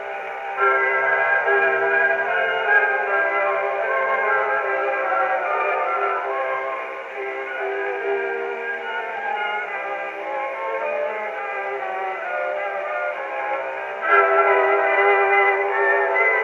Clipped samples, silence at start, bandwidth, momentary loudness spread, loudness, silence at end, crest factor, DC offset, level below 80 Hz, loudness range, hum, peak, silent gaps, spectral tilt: under 0.1%; 0 s; 7.2 kHz; 10 LU; -21 LUFS; 0 s; 18 dB; under 0.1%; -76 dBFS; 7 LU; none; -2 dBFS; none; -4 dB/octave